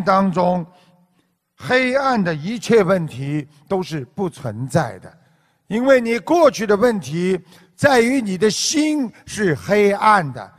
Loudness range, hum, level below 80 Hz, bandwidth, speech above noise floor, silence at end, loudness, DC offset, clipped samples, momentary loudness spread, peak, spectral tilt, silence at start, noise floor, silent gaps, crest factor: 5 LU; none; -54 dBFS; 15 kHz; 47 dB; 0.1 s; -18 LUFS; under 0.1%; under 0.1%; 11 LU; 0 dBFS; -5 dB/octave; 0 s; -64 dBFS; none; 18 dB